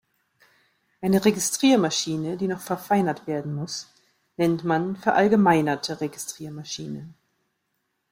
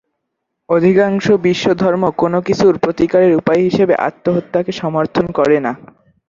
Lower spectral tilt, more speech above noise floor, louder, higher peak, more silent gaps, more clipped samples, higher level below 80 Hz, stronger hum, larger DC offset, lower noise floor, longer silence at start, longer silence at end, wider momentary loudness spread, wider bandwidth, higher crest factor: second, -4.5 dB/octave vs -7 dB/octave; second, 53 dB vs 61 dB; second, -24 LUFS vs -14 LUFS; second, -6 dBFS vs -2 dBFS; neither; neither; second, -64 dBFS vs -50 dBFS; neither; neither; about the same, -76 dBFS vs -74 dBFS; first, 1 s vs 0.7 s; first, 1 s vs 0.5 s; first, 14 LU vs 6 LU; first, 16.5 kHz vs 7.6 kHz; first, 18 dB vs 12 dB